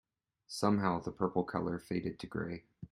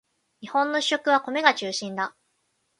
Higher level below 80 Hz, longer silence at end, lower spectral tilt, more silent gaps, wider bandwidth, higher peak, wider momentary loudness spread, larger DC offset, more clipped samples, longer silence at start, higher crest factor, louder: first, -64 dBFS vs -78 dBFS; second, 0.05 s vs 0.7 s; first, -6.5 dB/octave vs -2.5 dB/octave; neither; first, 15 kHz vs 11.5 kHz; second, -16 dBFS vs -4 dBFS; about the same, 11 LU vs 10 LU; neither; neither; about the same, 0.5 s vs 0.4 s; about the same, 22 dB vs 24 dB; second, -36 LUFS vs -24 LUFS